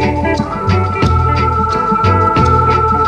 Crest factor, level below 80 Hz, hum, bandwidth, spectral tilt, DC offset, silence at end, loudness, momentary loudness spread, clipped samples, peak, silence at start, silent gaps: 12 dB; -24 dBFS; none; 9.2 kHz; -7.5 dB/octave; under 0.1%; 0 s; -12 LUFS; 5 LU; under 0.1%; 0 dBFS; 0 s; none